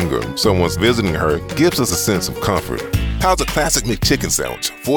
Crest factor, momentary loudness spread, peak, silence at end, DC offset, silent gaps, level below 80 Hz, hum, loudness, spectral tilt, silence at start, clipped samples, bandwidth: 14 dB; 5 LU; -2 dBFS; 0 s; under 0.1%; none; -30 dBFS; none; -17 LUFS; -4 dB/octave; 0 s; under 0.1%; over 20 kHz